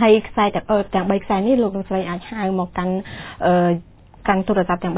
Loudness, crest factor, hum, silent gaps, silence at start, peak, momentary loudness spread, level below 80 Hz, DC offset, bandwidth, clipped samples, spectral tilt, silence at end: -20 LUFS; 16 dB; none; none; 0 s; -2 dBFS; 9 LU; -44 dBFS; under 0.1%; 4 kHz; under 0.1%; -11 dB/octave; 0 s